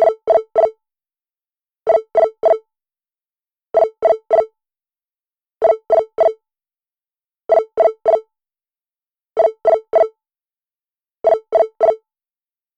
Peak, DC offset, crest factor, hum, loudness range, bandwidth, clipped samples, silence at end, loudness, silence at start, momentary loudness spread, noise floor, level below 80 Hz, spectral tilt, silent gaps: -4 dBFS; under 0.1%; 14 dB; none; 2 LU; 6 kHz; under 0.1%; 0.8 s; -17 LUFS; 0 s; 6 LU; under -90 dBFS; -62 dBFS; -5 dB/octave; none